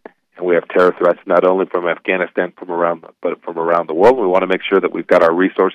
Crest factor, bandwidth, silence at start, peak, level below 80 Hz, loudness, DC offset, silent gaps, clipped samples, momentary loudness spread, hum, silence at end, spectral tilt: 14 dB; 9 kHz; 0.4 s; 0 dBFS; -56 dBFS; -16 LUFS; under 0.1%; none; under 0.1%; 10 LU; none; 0 s; -7 dB/octave